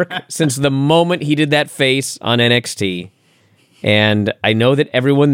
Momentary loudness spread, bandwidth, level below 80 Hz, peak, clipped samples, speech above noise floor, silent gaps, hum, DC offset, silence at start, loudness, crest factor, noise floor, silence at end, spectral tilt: 8 LU; 16.5 kHz; -58 dBFS; 0 dBFS; under 0.1%; 40 dB; none; none; under 0.1%; 0 s; -15 LUFS; 14 dB; -54 dBFS; 0 s; -5 dB/octave